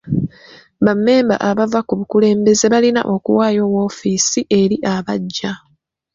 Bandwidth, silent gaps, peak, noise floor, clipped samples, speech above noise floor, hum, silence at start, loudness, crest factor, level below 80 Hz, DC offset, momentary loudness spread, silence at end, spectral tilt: 7.6 kHz; none; -2 dBFS; -44 dBFS; under 0.1%; 29 dB; none; 0.05 s; -15 LUFS; 14 dB; -52 dBFS; under 0.1%; 9 LU; 0.55 s; -4.5 dB/octave